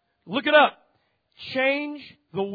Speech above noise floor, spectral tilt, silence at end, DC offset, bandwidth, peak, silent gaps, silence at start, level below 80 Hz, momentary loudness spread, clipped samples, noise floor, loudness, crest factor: 46 dB; -6.5 dB/octave; 0 s; under 0.1%; 5 kHz; -4 dBFS; none; 0.25 s; -72 dBFS; 19 LU; under 0.1%; -69 dBFS; -22 LUFS; 20 dB